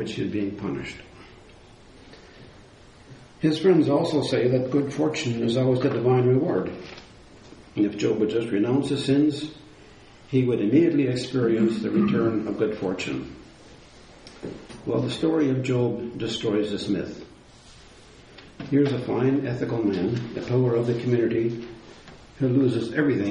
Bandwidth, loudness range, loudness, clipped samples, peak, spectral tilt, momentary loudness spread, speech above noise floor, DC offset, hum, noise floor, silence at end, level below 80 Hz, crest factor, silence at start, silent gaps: 10.5 kHz; 5 LU; -24 LUFS; under 0.1%; -8 dBFS; -7 dB/octave; 15 LU; 26 dB; under 0.1%; none; -49 dBFS; 0 s; -56 dBFS; 18 dB; 0 s; none